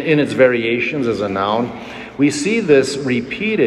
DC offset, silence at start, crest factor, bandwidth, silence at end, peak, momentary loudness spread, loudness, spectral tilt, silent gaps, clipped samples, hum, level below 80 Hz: under 0.1%; 0 s; 16 dB; 12 kHz; 0 s; 0 dBFS; 7 LU; -16 LUFS; -5 dB/octave; none; under 0.1%; none; -52 dBFS